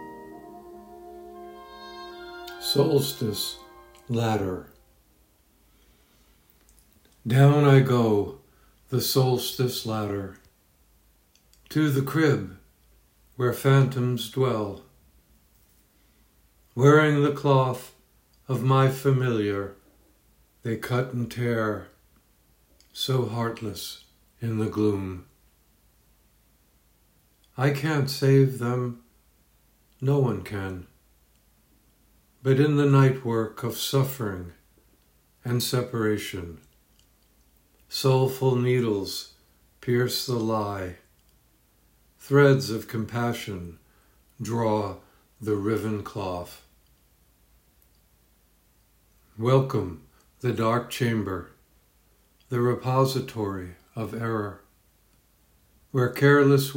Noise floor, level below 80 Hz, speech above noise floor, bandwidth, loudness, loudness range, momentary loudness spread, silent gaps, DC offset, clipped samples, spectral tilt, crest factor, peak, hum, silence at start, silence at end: -63 dBFS; -62 dBFS; 39 dB; 16.5 kHz; -25 LUFS; 8 LU; 21 LU; none; under 0.1%; under 0.1%; -6.5 dB/octave; 22 dB; -4 dBFS; none; 0 s; 0 s